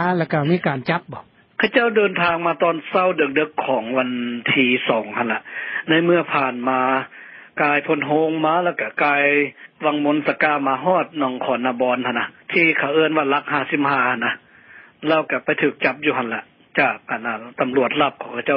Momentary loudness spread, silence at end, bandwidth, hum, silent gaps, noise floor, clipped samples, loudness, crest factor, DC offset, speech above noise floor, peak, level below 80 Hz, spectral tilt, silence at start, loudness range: 9 LU; 0 s; 5.6 kHz; none; none; -46 dBFS; under 0.1%; -19 LUFS; 18 dB; under 0.1%; 27 dB; -2 dBFS; -68 dBFS; -10.5 dB/octave; 0 s; 2 LU